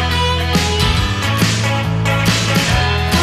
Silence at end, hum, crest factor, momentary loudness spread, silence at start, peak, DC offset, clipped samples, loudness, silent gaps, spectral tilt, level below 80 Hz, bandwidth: 0 s; none; 12 dB; 3 LU; 0 s; -2 dBFS; under 0.1%; under 0.1%; -15 LUFS; none; -4.5 dB/octave; -24 dBFS; 15 kHz